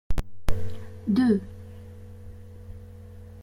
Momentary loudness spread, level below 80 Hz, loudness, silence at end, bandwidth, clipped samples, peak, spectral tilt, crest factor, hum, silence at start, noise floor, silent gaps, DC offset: 23 LU; -38 dBFS; -27 LUFS; 0 s; 14 kHz; under 0.1%; -10 dBFS; -7.5 dB/octave; 16 dB; none; 0.1 s; -44 dBFS; none; under 0.1%